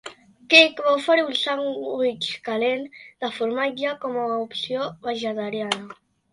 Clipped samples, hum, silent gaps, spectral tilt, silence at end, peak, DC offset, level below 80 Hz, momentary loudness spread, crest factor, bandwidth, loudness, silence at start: under 0.1%; none; none; -3 dB/octave; 0.4 s; 0 dBFS; under 0.1%; -72 dBFS; 14 LU; 24 dB; 11.5 kHz; -22 LUFS; 0.05 s